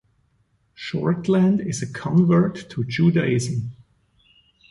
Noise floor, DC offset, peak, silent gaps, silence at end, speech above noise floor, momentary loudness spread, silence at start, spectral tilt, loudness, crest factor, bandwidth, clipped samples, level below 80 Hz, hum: -65 dBFS; under 0.1%; -6 dBFS; none; 0.95 s; 45 dB; 12 LU; 0.8 s; -7 dB/octave; -21 LUFS; 16 dB; 11.5 kHz; under 0.1%; -56 dBFS; none